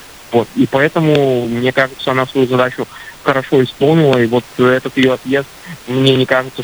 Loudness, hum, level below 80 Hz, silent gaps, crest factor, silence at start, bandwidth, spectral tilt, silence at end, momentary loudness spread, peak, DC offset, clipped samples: -14 LUFS; none; -50 dBFS; none; 14 dB; 0 s; over 20 kHz; -6.5 dB/octave; 0 s; 7 LU; 0 dBFS; under 0.1%; under 0.1%